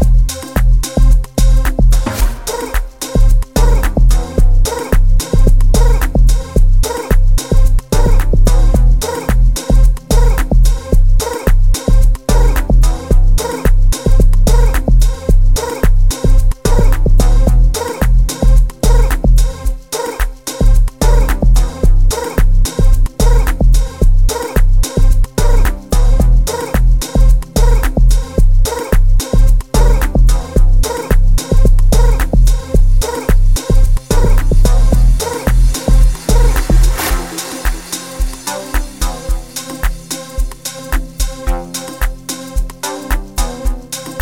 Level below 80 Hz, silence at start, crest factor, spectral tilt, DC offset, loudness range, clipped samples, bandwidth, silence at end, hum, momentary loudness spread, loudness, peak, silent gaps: -10 dBFS; 0 s; 10 dB; -5.5 dB/octave; 0.5%; 7 LU; under 0.1%; 16 kHz; 0 s; none; 8 LU; -15 LUFS; 0 dBFS; none